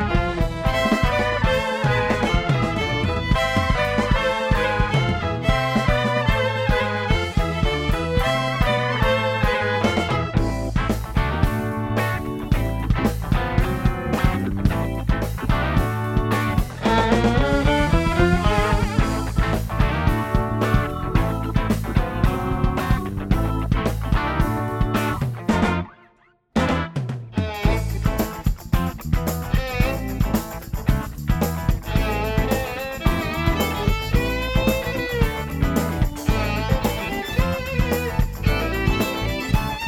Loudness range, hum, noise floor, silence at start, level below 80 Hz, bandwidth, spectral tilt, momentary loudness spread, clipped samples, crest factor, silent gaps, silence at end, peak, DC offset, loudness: 4 LU; none; -58 dBFS; 0 s; -26 dBFS; 17 kHz; -6 dB/octave; 5 LU; under 0.1%; 18 dB; none; 0 s; -4 dBFS; under 0.1%; -22 LUFS